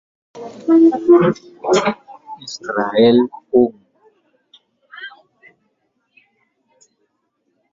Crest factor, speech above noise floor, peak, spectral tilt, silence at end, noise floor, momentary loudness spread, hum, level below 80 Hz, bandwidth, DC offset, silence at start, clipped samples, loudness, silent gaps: 18 dB; 55 dB; -2 dBFS; -6 dB/octave; 2.65 s; -69 dBFS; 22 LU; none; -60 dBFS; 7.6 kHz; under 0.1%; 0.35 s; under 0.1%; -15 LUFS; none